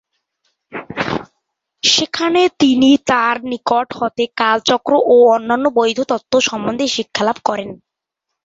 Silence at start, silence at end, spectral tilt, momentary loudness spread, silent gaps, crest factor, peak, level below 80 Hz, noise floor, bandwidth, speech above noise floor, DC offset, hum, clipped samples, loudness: 0.7 s; 0.7 s; -3 dB/octave; 11 LU; none; 16 dB; 0 dBFS; -54 dBFS; -79 dBFS; 8 kHz; 64 dB; under 0.1%; none; under 0.1%; -15 LUFS